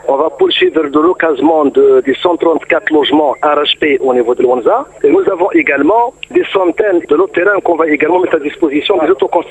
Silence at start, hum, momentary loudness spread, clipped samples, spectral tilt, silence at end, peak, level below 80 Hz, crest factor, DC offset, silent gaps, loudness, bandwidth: 0.05 s; none; 3 LU; under 0.1%; -5.5 dB/octave; 0 s; 0 dBFS; -52 dBFS; 10 dB; under 0.1%; none; -11 LUFS; 8.4 kHz